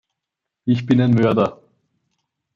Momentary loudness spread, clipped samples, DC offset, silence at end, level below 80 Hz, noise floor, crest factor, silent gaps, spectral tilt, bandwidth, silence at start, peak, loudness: 8 LU; under 0.1%; under 0.1%; 1 s; -58 dBFS; -83 dBFS; 16 dB; none; -9 dB/octave; 7.2 kHz; 0.65 s; -4 dBFS; -18 LUFS